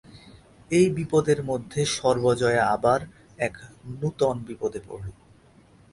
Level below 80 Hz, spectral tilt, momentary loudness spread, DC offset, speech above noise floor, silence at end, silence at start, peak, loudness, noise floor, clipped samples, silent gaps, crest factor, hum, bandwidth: -54 dBFS; -5.5 dB/octave; 17 LU; under 0.1%; 31 dB; 0.8 s; 0.15 s; -8 dBFS; -24 LUFS; -55 dBFS; under 0.1%; none; 18 dB; none; 11.5 kHz